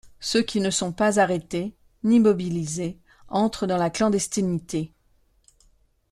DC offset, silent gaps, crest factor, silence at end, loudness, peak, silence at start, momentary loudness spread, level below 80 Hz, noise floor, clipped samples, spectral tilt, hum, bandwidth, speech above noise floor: under 0.1%; none; 18 dB; 1.25 s; -24 LUFS; -6 dBFS; 0.05 s; 11 LU; -54 dBFS; -63 dBFS; under 0.1%; -5 dB/octave; none; 13 kHz; 40 dB